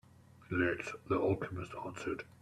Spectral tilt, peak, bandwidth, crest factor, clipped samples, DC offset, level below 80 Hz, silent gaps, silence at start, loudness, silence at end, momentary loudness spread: -6.5 dB/octave; -20 dBFS; 13 kHz; 18 dB; under 0.1%; under 0.1%; -64 dBFS; none; 0.35 s; -37 LUFS; 0.1 s; 9 LU